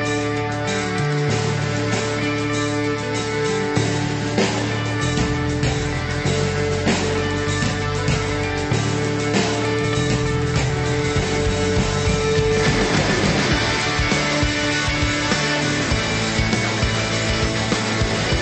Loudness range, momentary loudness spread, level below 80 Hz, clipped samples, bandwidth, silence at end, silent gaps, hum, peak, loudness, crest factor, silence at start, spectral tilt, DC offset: 3 LU; 4 LU; -34 dBFS; under 0.1%; 8.8 kHz; 0 s; none; none; -4 dBFS; -20 LUFS; 16 dB; 0 s; -4.5 dB/octave; under 0.1%